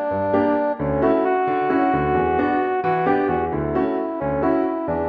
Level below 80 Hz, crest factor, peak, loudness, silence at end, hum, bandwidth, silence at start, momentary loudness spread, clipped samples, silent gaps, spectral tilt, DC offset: -42 dBFS; 14 dB; -6 dBFS; -20 LUFS; 0 s; none; 5 kHz; 0 s; 3 LU; under 0.1%; none; -10 dB/octave; under 0.1%